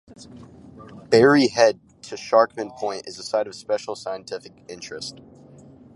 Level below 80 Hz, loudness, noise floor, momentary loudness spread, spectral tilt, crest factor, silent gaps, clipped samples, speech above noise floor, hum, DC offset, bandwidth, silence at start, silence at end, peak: -62 dBFS; -21 LUFS; -47 dBFS; 20 LU; -4.5 dB/octave; 20 dB; none; under 0.1%; 25 dB; none; under 0.1%; 11.5 kHz; 0.35 s; 0.85 s; -2 dBFS